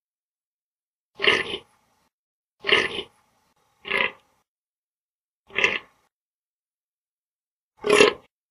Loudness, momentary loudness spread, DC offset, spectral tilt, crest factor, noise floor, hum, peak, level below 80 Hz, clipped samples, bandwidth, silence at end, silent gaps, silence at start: -22 LUFS; 17 LU; under 0.1%; -2 dB/octave; 28 dB; under -90 dBFS; none; 0 dBFS; -62 dBFS; under 0.1%; 12 kHz; 0.35 s; 2.13-2.57 s, 4.48-5.44 s, 6.12-6.66 s, 6.74-7.71 s; 1.2 s